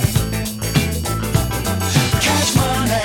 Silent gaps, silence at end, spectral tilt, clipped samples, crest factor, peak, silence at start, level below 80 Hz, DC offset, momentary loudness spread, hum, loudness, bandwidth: none; 0 s; -4 dB/octave; under 0.1%; 18 dB; 0 dBFS; 0 s; -30 dBFS; under 0.1%; 6 LU; none; -18 LUFS; 17.5 kHz